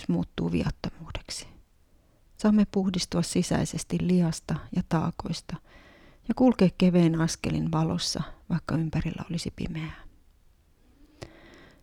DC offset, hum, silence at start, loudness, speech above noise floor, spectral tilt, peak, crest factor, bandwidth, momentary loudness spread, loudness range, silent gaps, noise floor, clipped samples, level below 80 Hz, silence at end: under 0.1%; none; 0 s; -27 LUFS; 35 dB; -6 dB/octave; -10 dBFS; 18 dB; 13 kHz; 15 LU; 7 LU; none; -61 dBFS; under 0.1%; -48 dBFS; 0.3 s